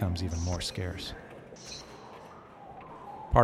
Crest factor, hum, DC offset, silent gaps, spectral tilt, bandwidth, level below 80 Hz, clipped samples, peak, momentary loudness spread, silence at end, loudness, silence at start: 26 dB; none; under 0.1%; none; -5.5 dB/octave; 14 kHz; -42 dBFS; under 0.1%; -6 dBFS; 16 LU; 0 s; -36 LUFS; 0 s